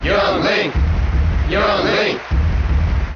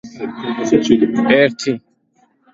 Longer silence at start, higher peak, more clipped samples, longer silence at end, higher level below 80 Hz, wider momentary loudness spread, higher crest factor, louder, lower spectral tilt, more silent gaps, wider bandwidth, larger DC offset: about the same, 0 s vs 0.05 s; second, -6 dBFS vs 0 dBFS; neither; second, 0 s vs 0.75 s; first, -20 dBFS vs -52 dBFS; second, 3 LU vs 13 LU; second, 10 dB vs 16 dB; about the same, -17 LUFS vs -15 LUFS; about the same, -4.5 dB/octave vs -5 dB/octave; neither; second, 6.8 kHz vs 7.8 kHz; neither